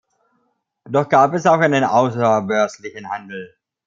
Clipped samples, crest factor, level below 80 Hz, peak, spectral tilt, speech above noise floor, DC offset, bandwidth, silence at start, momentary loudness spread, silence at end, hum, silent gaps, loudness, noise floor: under 0.1%; 16 dB; -64 dBFS; -2 dBFS; -6 dB/octave; 51 dB; under 0.1%; 7.6 kHz; 0.85 s; 16 LU; 0.4 s; none; none; -17 LUFS; -68 dBFS